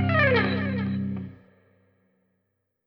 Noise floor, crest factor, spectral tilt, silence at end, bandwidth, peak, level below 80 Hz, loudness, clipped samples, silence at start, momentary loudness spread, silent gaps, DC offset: -77 dBFS; 18 dB; -9 dB/octave; 1.5 s; 5.8 kHz; -8 dBFS; -56 dBFS; -25 LUFS; under 0.1%; 0 s; 15 LU; none; under 0.1%